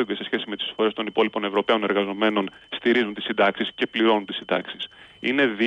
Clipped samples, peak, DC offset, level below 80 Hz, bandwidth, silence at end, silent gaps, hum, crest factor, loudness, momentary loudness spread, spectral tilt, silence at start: under 0.1%; -8 dBFS; under 0.1%; -68 dBFS; 7.8 kHz; 0 s; none; none; 16 dB; -23 LUFS; 7 LU; -6 dB/octave; 0 s